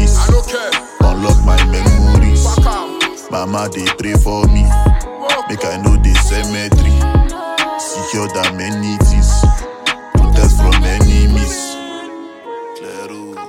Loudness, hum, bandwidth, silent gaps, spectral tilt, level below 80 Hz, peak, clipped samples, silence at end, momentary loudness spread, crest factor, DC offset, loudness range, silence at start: -14 LUFS; none; 14 kHz; none; -5 dB/octave; -14 dBFS; 0 dBFS; under 0.1%; 0 s; 14 LU; 12 dB; under 0.1%; 2 LU; 0 s